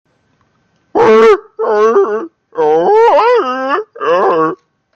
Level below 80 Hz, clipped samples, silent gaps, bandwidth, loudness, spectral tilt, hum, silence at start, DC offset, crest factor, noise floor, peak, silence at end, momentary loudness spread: -54 dBFS; under 0.1%; none; 7.4 kHz; -11 LUFS; -5.5 dB/octave; none; 0.95 s; under 0.1%; 10 dB; -58 dBFS; 0 dBFS; 0.4 s; 10 LU